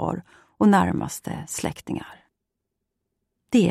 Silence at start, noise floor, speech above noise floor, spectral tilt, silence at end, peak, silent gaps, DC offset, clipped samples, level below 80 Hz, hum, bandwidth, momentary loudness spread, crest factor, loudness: 0 s; -81 dBFS; 58 dB; -6 dB/octave; 0 s; -6 dBFS; none; under 0.1%; under 0.1%; -54 dBFS; none; 15 kHz; 15 LU; 18 dB; -24 LUFS